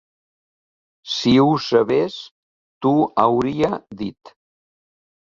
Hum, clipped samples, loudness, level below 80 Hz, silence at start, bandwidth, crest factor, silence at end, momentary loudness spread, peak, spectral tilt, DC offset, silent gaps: none; under 0.1%; -18 LUFS; -56 dBFS; 1.05 s; 7.6 kHz; 18 dB; 1.05 s; 15 LU; -2 dBFS; -6.5 dB/octave; under 0.1%; 2.31-2.81 s